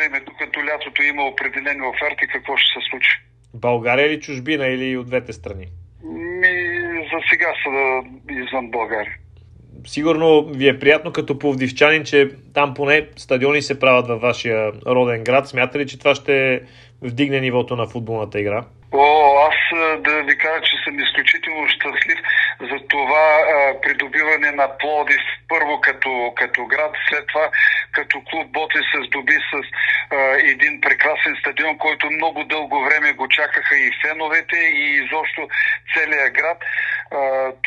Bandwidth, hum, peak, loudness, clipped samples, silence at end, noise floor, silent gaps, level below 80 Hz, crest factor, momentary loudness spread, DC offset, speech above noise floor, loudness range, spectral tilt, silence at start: 10 kHz; none; 0 dBFS; -17 LUFS; under 0.1%; 0.1 s; -44 dBFS; none; -56 dBFS; 18 dB; 9 LU; under 0.1%; 26 dB; 4 LU; -4.5 dB/octave; 0 s